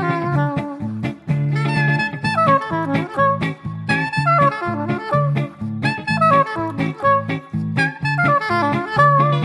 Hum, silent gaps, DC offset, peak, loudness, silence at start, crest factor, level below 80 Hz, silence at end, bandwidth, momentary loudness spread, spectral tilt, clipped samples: none; none; under 0.1%; -2 dBFS; -18 LUFS; 0 s; 16 dB; -52 dBFS; 0 s; 10 kHz; 9 LU; -7.5 dB/octave; under 0.1%